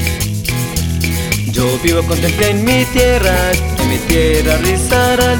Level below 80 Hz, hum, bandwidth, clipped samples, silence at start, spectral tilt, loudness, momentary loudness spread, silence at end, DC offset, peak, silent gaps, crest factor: -22 dBFS; none; over 20 kHz; under 0.1%; 0 s; -4.5 dB/octave; -13 LUFS; 6 LU; 0 s; under 0.1%; 0 dBFS; none; 12 dB